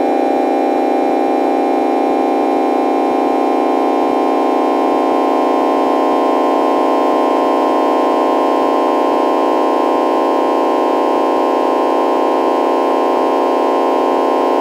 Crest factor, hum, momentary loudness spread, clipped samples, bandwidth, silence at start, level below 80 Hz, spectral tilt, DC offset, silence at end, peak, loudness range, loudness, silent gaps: 12 dB; none; 1 LU; under 0.1%; 16 kHz; 0 s; -64 dBFS; -4.5 dB/octave; under 0.1%; 0 s; 0 dBFS; 1 LU; -14 LUFS; none